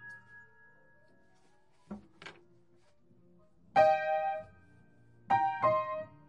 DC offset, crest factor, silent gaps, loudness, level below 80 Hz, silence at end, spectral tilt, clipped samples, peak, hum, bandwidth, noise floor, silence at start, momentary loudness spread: under 0.1%; 22 dB; none; -30 LUFS; -74 dBFS; 0.2 s; -6 dB/octave; under 0.1%; -14 dBFS; none; 8.8 kHz; -69 dBFS; 0 s; 25 LU